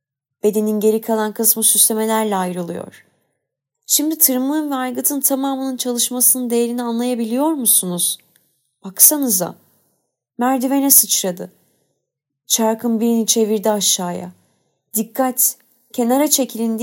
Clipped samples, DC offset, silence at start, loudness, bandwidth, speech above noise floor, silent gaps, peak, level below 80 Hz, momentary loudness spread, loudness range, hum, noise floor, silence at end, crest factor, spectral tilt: under 0.1%; under 0.1%; 0.45 s; -16 LUFS; 16.5 kHz; 60 dB; none; 0 dBFS; -76 dBFS; 13 LU; 3 LU; none; -78 dBFS; 0 s; 18 dB; -2.5 dB/octave